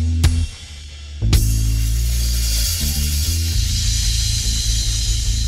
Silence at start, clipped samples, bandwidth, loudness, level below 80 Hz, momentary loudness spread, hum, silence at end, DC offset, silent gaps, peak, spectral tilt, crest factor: 0 s; under 0.1%; 16.5 kHz; -19 LUFS; -20 dBFS; 7 LU; none; 0 s; under 0.1%; none; -2 dBFS; -3 dB/octave; 16 dB